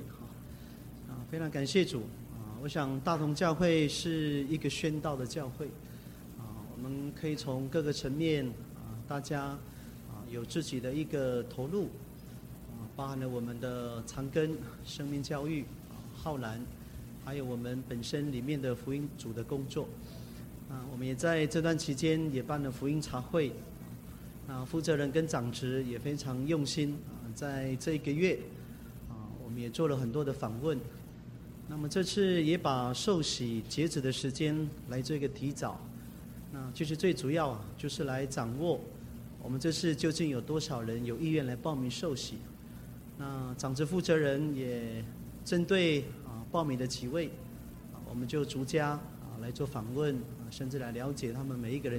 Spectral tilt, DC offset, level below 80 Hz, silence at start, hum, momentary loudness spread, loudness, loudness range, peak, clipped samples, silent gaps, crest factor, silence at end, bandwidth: -5.5 dB/octave; under 0.1%; -56 dBFS; 0 s; none; 16 LU; -35 LUFS; 5 LU; -14 dBFS; under 0.1%; none; 20 dB; 0 s; 16.5 kHz